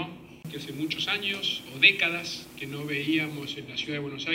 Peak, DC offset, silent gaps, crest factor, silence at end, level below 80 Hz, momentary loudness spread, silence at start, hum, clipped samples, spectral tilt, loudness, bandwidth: -4 dBFS; under 0.1%; none; 26 dB; 0 s; -66 dBFS; 18 LU; 0 s; none; under 0.1%; -3.5 dB/octave; -26 LUFS; 16 kHz